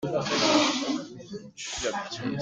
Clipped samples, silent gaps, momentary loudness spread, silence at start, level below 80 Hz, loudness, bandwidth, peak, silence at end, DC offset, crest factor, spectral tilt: under 0.1%; none; 18 LU; 0 s; -58 dBFS; -26 LUFS; 9.6 kHz; -8 dBFS; 0 s; under 0.1%; 20 dB; -3 dB/octave